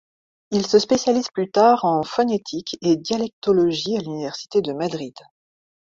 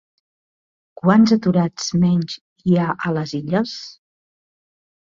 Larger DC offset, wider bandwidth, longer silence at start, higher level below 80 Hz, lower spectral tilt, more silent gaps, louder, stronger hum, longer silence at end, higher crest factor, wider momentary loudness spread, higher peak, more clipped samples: neither; about the same, 7.8 kHz vs 7.6 kHz; second, 0.5 s vs 1.05 s; second, -62 dBFS vs -56 dBFS; second, -5 dB/octave vs -6.5 dB/octave; second, 3.33-3.42 s vs 2.41-2.56 s; about the same, -21 LUFS vs -19 LUFS; neither; second, 0.75 s vs 1.15 s; about the same, 18 dB vs 18 dB; about the same, 11 LU vs 13 LU; about the same, -4 dBFS vs -2 dBFS; neither